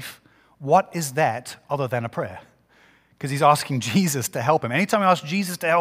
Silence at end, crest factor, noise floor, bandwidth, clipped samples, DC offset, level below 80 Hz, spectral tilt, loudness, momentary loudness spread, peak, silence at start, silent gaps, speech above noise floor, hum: 0 s; 20 dB; -57 dBFS; 16 kHz; under 0.1%; under 0.1%; -66 dBFS; -5 dB/octave; -22 LUFS; 13 LU; -4 dBFS; 0 s; none; 35 dB; none